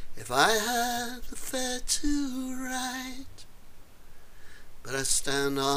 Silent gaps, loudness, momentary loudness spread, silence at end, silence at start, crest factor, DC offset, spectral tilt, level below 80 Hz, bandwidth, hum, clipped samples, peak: none; -29 LUFS; 15 LU; 0 s; 0 s; 24 dB; under 0.1%; -2 dB/octave; -44 dBFS; 15.5 kHz; none; under 0.1%; -6 dBFS